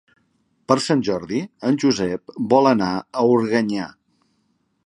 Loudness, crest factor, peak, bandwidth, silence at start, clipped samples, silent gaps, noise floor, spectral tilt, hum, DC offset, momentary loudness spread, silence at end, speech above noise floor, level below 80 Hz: -20 LUFS; 20 dB; -2 dBFS; 11 kHz; 0.7 s; under 0.1%; none; -67 dBFS; -5.5 dB/octave; none; under 0.1%; 10 LU; 1 s; 48 dB; -58 dBFS